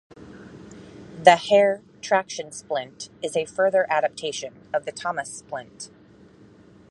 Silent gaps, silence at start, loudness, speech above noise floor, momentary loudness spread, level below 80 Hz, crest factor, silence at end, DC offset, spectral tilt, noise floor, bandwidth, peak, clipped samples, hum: none; 0.2 s; -23 LUFS; 28 dB; 26 LU; -64 dBFS; 24 dB; 1.05 s; under 0.1%; -3 dB/octave; -51 dBFS; 11.5 kHz; -2 dBFS; under 0.1%; none